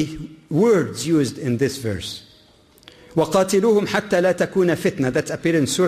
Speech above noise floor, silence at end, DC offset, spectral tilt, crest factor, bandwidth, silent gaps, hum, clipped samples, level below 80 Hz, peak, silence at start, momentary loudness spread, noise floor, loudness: 33 dB; 0 s; under 0.1%; -5.5 dB/octave; 14 dB; 15.5 kHz; none; none; under 0.1%; -52 dBFS; -6 dBFS; 0 s; 10 LU; -52 dBFS; -20 LUFS